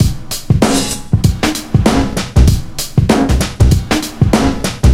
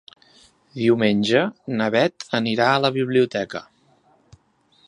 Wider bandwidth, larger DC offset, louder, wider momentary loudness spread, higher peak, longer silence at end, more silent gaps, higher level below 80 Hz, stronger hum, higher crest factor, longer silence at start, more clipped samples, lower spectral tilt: first, 16.5 kHz vs 11 kHz; neither; first, -13 LUFS vs -20 LUFS; second, 5 LU vs 9 LU; about the same, 0 dBFS vs -2 dBFS; second, 0 s vs 1.25 s; neither; first, -18 dBFS vs -64 dBFS; neither; second, 12 dB vs 20 dB; second, 0 s vs 0.75 s; first, 0.4% vs under 0.1%; about the same, -5.5 dB/octave vs -5.5 dB/octave